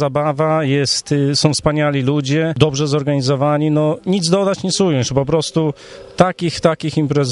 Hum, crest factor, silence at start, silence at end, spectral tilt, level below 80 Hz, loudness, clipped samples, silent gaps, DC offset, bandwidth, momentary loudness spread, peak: none; 16 dB; 0 s; 0 s; -5.5 dB/octave; -44 dBFS; -16 LUFS; under 0.1%; none; under 0.1%; 11.5 kHz; 3 LU; 0 dBFS